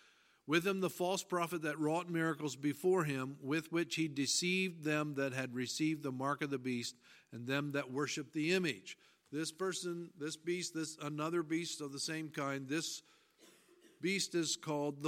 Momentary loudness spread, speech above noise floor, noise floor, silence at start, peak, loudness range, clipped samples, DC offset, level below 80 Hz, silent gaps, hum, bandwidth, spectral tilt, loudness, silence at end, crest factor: 8 LU; 28 dB; -66 dBFS; 0.45 s; -16 dBFS; 4 LU; under 0.1%; under 0.1%; -86 dBFS; none; none; 16.5 kHz; -4 dB/octave; -38 LUFS; 0 s; 22 dB